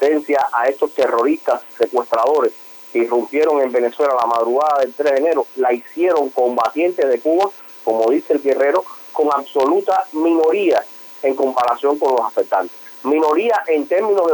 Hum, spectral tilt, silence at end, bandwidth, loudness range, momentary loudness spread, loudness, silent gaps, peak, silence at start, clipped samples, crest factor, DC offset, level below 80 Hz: none; -4.5 dB/octave; 0 s; over 20 kHz; 1 LU; 5 LU; -17 LUFS; none; -2 dBFS; 0 s; under 0.1%; 14 dB; under 0.1%; -70 dBFS